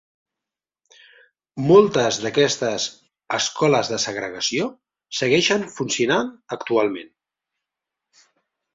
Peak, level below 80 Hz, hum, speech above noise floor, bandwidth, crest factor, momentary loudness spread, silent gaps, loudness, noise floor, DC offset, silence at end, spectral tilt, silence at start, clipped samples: -2 dBFS; -62 dBFS; none; 68 dB; 7.8 kHz; 20 dB; 14 LU; none; -20 LUFS; -88 dBFS; under 0.1%; 1.7 s; -3.5 dB/octave; 1.55 s; under 0.1%